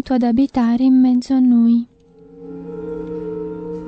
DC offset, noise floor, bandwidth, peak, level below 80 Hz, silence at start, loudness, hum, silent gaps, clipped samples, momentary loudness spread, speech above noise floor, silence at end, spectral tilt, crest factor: under 0.1%; -44 dBFS; 7.8 kHz; -6 dBFS; -48 dBFS; 0.05 s; -16 LUFS; none; none; under 0.1%; 18 LU; 30 dB; 0 s; -7.5 dB/octave; 12 dB